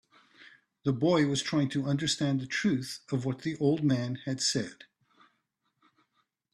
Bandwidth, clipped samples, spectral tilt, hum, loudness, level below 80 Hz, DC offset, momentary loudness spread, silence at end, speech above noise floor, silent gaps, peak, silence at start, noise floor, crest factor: 12.5 kHz; under 0.1%; -5 dB/octave; none; -29 LUFS; -68 dBFS; under 0.1%; 7 LU; 1.8 s; 49 dB; none; -14 dBFS; 0.4 s; -78 dBFS; 16 dB